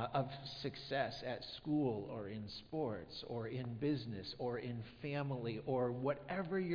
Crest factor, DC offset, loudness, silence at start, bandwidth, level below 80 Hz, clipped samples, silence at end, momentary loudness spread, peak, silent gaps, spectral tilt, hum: 18 dB; under 0.1%; -42 LUFS; 0 s; 5.2 kHz; -68 dBFS; under 0.1%; 0 s; 8 LU; -22 dBFS; none; -5.5 dB/octave; none